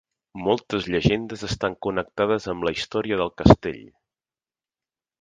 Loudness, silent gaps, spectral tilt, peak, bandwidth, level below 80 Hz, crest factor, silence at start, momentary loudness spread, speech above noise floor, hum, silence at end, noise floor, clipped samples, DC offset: -23 LUFS; none; -6.5 dB/octave; 0 dBFS; 9.6 kHz; -42 dBFS; 24 dB; 0.35 s; 13 LU; over 67 dB; none; 1.4 s; under -90 dBFS; under 0.1%; under 0.1%